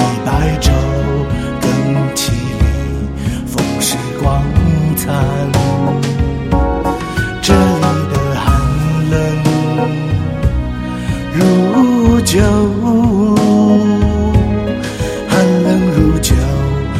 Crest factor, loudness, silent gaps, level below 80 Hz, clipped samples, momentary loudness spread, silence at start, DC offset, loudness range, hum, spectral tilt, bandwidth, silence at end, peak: 12 dB; -14 LUFS; none; -22 dBFS; 0.1%; 7 LU; 0 s; under 0.1%; 4 LU; none; -6 dB/octave; 16 kHz; 0 s; 0 dBFS